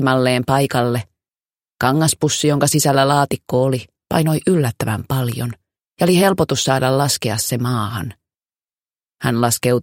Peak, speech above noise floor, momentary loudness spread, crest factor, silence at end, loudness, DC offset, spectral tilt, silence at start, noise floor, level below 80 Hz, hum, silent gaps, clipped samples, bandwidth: 0 dBFS; over 73 dB; 9 LU; 18 dB; 0 s; -17 LUFS; under 0.1%; -5 dB/octave; 0 s; under -90 dBFS; -50 dBFS; none; none; under 0.1%; 17 kHz